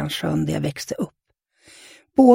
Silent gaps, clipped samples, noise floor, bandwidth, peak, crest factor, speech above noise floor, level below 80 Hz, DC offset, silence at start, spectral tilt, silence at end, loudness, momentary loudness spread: none; under 0.1%; -65 dBFS; 16.5 kHz; -2 dBFS; 20 dB; 41 dB; -52 dBFS; under 0.1%; 0 s; -6.5 dB/octave; 0 s; -24 LUFS; 10 LU